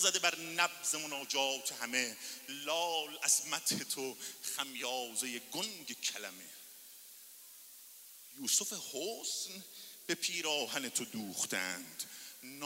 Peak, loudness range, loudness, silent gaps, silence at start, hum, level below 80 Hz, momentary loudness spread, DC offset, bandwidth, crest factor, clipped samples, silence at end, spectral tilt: -14 dBFS; 6 LU; -36 LUFS; none; 0 s; none; under -90 dBFS; 20 LU; under 0.1%; 16 kHz; 26 dB; under 0.1%; 0 s; 0 dB/octave